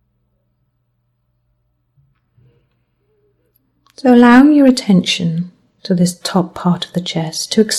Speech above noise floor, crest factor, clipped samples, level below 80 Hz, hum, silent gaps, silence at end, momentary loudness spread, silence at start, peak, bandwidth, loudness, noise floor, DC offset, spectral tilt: 53 dB; 16 dB; under 0.1%; -54 dBFS; 60 Hz at -40 dBFS; none; 0 s; 13 LU; 4.05 s; 0 dBFS; 13 kHz; -13 LUFS; -65 dBFS; under 0.1%; -5.5 dB/octave